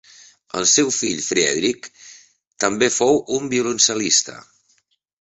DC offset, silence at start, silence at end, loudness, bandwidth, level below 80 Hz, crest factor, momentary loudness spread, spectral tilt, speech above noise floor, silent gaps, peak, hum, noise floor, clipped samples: under 0.1%; 0.55 s; 0.8 s; -18 LUFS; 8.2 kHz; -60 dBFS; 20 dB; 11 LU; -1.5 dB/octave; 45 dB; 2.47-2.51 s; -2 dBFS; none; -64 dBFS; under 0.1%